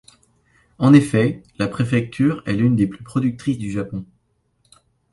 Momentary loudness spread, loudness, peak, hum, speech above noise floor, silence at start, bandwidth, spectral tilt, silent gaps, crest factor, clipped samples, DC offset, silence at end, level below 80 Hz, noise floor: 12 LU; -19 LUFS; 0 dBFS; none; 47 dB; 0.8 s; 11.5 kHz; -7.5 dB/octave; none; 20 dB; under 0.1%; under 0.1%; 1.1 s; -50 dBFS; -66 dBFS